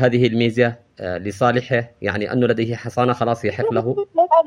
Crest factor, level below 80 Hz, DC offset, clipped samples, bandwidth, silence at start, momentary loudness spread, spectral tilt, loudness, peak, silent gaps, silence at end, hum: 18 dB; -56 dBFS; under 0.1%; under 0.1%; 11 kHz; 0 s; 8 LU; -7 dB/octave; -20 LUFS; -2 dBFS; none; 0 s; none